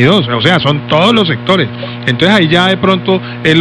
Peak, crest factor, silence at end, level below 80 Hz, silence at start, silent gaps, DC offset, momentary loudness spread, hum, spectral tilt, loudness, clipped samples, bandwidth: 0 dBFS; 10 dB; 0 s; -42 dBFS; 0 s; none; under 0.1%; 6 LU; 60 Hz at -25 dBFS; -6 dB/octave; -10 LUFS; 0.3%; 11 kHz